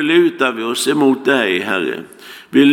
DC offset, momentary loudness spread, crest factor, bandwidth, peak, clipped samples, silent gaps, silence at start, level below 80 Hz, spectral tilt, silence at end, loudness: under 0.1%; 14 LU; 14 dB; 17.5 kHz; 0 dBFS; under 0.1%; none; 0 s; -70 dBFS; -4 dB/octave; 0 s; -15 LUFS